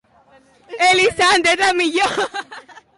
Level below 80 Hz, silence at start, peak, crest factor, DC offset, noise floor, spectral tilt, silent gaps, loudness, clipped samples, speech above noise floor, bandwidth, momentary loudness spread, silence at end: -54 dBFS; 0.7 s; -6 dBFS; 12 dB; under 0.1%; -52 dBFS; -1.5 dB/octave; none; -15 LUFS; under 0.1%; 36 dB; 11.5 kHz; 17 LU; 0.2 s